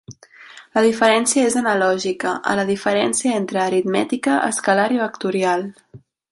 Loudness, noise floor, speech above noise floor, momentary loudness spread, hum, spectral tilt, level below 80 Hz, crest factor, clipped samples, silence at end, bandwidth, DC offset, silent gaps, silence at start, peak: -18 LUFS; -43 dBFS; 25 dB; 6 LU; none; -3.5 dB/octave; -62 dBFS; 16 dB; under 0.1%; 0.35 s; 11.5 kHz; under 0.1%; none; 0.1 s; -2 dBFS